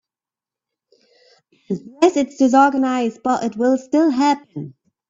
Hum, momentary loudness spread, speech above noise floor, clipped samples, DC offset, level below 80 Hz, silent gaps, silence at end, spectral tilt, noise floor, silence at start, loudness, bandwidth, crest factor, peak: none; 15 LU; 73 dB; under 0.1%; under 0.1%; -64 dBFS; none; 0.4 s; -5.5 dB/octave; -90 dBFS; 1.7 s; -18 LUFS; 8 kHz; 18 dB; 0 dBFS